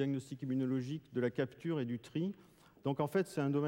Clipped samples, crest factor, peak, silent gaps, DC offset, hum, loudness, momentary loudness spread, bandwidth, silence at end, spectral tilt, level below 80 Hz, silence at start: under 0.1%; 16 dB; -22 dBFS; none; under 0.1%; none; -38 LUFS; 6 LU; 16.5 kHz; 0 s; -7.5 dB/octave; -76 dBFS; 0 s